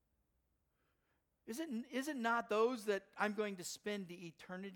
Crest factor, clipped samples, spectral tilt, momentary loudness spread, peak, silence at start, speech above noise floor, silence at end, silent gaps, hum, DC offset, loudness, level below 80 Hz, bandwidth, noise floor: 20 dB; under 0.1%; -4 dB/octave; 14 LU; -22 dBFS; 1.45 s; 42 dB; 0 s; none; none; under 0.1%; -41 LUFS; -84 dBFS; 19 kHz; -83 dBFS